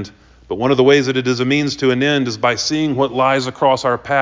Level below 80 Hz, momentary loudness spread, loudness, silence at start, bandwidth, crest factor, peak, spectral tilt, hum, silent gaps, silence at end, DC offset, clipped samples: -50 dBFS; 5 LU; -16 LUFS; 0 s; 7.6 kHz; 14 dB; -2 dBFS; -5 dB/octave; none; none; 0 s; under 0.1%; under 0.1%